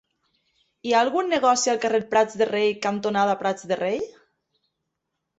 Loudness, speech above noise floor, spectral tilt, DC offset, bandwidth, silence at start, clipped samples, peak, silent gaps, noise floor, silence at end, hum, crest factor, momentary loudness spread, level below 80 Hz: -22 LUFS; 58 dB; -3.5 dB/octave; under 0.1%; 8.2 kHz; 0.85 s; under 0.1%; -6 dBFS; none; -80 dBFS; 1.3 s; none; 18 dB; 7 LU; -68 dBFS